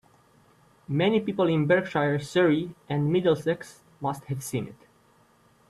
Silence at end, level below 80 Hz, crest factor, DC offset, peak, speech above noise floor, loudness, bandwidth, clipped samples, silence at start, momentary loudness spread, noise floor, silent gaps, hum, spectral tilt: 0.95 s; -64 dBFS; 18 dB; under 0.1%; -8 dBFS; 36 dB; -26 LUFS; 13.5 kHz; under 0.1%; 0.9 s; 11 LU; -61 dBFS; none; none; -6.5 dB/octave